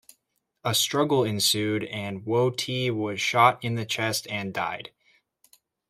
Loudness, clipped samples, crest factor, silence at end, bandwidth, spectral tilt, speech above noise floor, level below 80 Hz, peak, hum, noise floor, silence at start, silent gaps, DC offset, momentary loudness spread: -25 LUFS; under 0.1%; 22 dB; 1 s; 16 kHz; -3.5 dB/octave; 50 dB; -68 dBFS; -6 dBFS; none; -75 dBFS; 0.65 s; none; under 0.1%; 11 LU